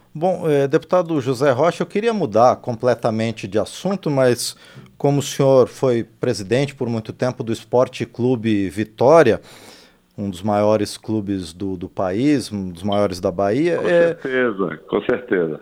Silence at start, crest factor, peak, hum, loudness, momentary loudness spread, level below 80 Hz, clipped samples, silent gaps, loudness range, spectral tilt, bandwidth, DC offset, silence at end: 0.15 s; 18 dB; -2 dBFS; none; -19 LUFS; 9 LU; -56 dBFS; under 0.1%; none; 3 LU; -6 dB/octave; 16 kHz; under 0.1%; 0 s